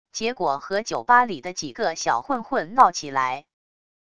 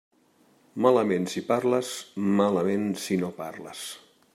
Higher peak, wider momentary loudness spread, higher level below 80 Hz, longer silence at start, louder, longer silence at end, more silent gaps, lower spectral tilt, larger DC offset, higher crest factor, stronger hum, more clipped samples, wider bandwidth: first, -2 dBFS vs -8 dBFS; second, 10 LU vs 15 LU; first, -62 dBFS vs -74 dBFS; second, 0.15 s vs 0.75 s; first, -22 LUFS vs -26 LUFS; first, 0.8 s vs 0.35 s; neither; second, -3 dB/octave vs -5.5 dB/octave; first, 0.3% vs under 0.1%; about the same, 22 dB vs 20 dB; neither; neither; second, 11 kHz vs 15.5 kHz